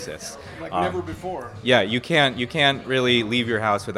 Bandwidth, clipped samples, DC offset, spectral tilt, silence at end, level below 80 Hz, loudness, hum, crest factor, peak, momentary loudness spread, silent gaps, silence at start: 14.5 kHz; under 0.1%; under 0.1%; -4.5 dB/octave; 0 s; -52 dBFS; -21 LUFS; none; 20 dB; -2 dBFS; 14 LU; none; 0 s